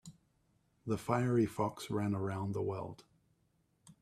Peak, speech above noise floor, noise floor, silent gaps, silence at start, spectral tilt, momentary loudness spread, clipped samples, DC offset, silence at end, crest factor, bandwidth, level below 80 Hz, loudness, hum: -16 dBFS; 41 dB; -76 dBFS; none; 0.05 s; -7 dB/octave; 14 LU; under 0.1%; under 0.1%; 0.1 s; 22 dB; 14.5 kHz; -68 dBFS; -36 LUFS; none